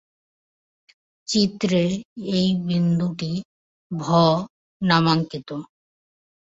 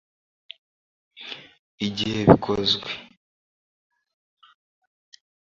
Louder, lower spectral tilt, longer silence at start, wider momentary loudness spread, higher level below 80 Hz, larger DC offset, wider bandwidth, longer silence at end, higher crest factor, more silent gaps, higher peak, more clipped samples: about the same, -22 LUFS vs -21 LUFS; about the same, -6 dB/octave vs -6 dB/octave; about the same, 1.3 s vs 1.2 s; second, 15 LU vs 28 LU; second, -58 dBFS vs -48 dBFS; neither; about the same, 7.8 kHz vs 7.6 kHz; second, 0.8 s vs 2.55 s; second, 22 dB vs 28 dB; first, 2.05-2.16 s, 3.45-3.90 s, 4.50-4.80 s vs 1.59-1.78 s; about the same, -2 dBFS vs 0 dBFS; neither